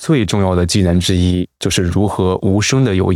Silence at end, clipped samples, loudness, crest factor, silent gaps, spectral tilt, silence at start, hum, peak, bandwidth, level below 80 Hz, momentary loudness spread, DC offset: 0 s; under 0.1%; -15 LUFS; 10 dB; none; -5.5 dB/octave; 0 s; none; -4 dBFS; 14.5 kHz; -40 dBFS; 3 LU; under 0.1%